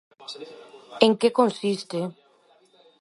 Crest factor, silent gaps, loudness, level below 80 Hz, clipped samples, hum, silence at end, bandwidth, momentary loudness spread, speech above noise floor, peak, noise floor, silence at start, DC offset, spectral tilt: 24 dB; none; -23 LUFS; -74 dBFS; under 0.1%; none; 0.9 s; 11.5 kHz; 21 LU; 36 dB; -2 dBFS; -60 dBFS; 0.2 s; under 0.1%; -5 dB/octave